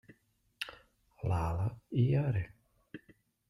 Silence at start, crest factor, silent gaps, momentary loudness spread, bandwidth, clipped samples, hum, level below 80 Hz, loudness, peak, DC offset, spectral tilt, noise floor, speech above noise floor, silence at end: 0.6 s; 18 dB; none; 23 LU; 12 kHz; under 0.1%; none; -54 dBFS; -35 LUFS; -18 dBFS; under 0.1%; -8 dB/octave; -70 dBFS; 39 dB; 0.5 s